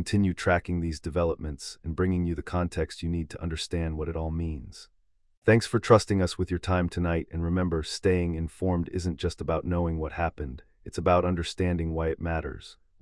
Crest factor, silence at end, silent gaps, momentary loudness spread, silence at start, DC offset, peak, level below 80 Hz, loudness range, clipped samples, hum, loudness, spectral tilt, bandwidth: 22 dB; 0.3 s; 5.37-5.42 s; 11 LU; 0 s; under 0.1%; -6 dBFS; -44 dBFS; 5 LU; under 0.1%; none; -28 LUFS; -6.5 dB/octave; 12 kHz